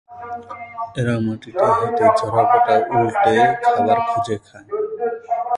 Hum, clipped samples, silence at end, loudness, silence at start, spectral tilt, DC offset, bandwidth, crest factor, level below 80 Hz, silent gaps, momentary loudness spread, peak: none; under 0.1%; 0 s; -18 LUFS; 0.1 s; -6.5 dB/octave; under 0.1%; 11.5 kHz; 16 dB; -54 dBFS; none; 15 LU; -2 dBFS